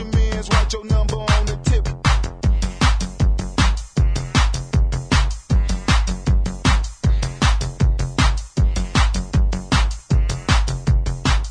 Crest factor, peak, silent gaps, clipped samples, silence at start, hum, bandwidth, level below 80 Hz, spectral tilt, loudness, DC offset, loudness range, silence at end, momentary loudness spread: 14 dB; -2 dBFS; none; under 0.1%; 0 s; none; 10.5 kHz; -20 dBFS; -5 dB/octave; -20 LUFS; under 0.1%; 0 LU; 0 s; 2 LU